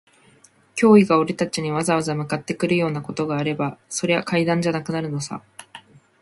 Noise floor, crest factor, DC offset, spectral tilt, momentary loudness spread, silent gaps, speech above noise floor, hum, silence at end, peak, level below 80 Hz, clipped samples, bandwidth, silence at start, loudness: -55 dBFS; 20 dB; under 0.1%; -5.5 dB/octave; 14 LU; none; 34 dB; none; 0.4 s; -2 dBFS; -60 dBFS; under 0.1%; 11.5 kHz; 0.75 s; -21 LUFS